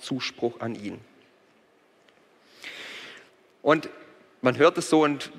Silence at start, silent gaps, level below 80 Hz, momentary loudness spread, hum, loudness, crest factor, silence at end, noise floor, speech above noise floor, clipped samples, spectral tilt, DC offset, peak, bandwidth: 0 s; none; -74 dBFS; 21 LU; none; -25 LUFS; 22 dB; 0 s; -61 dBFS; 37 dB; under 0.1%; -5 dB/octave; under 0.1%; -6 dBFS; 14 kHz